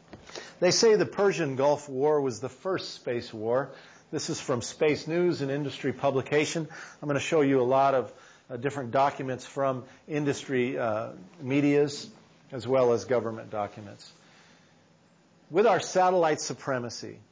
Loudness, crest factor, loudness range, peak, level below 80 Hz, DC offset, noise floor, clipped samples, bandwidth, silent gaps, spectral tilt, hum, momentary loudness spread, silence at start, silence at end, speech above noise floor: -27 LUFS; 16 dB; 4 LU; -12 dBFS; -68 dBFS; under 0.1%; -61 dBFS; under 0.1%; 8 kHz; none; -5 dB/octave; none; 15 LU; 0.1 s; 0.15 s; 34 dB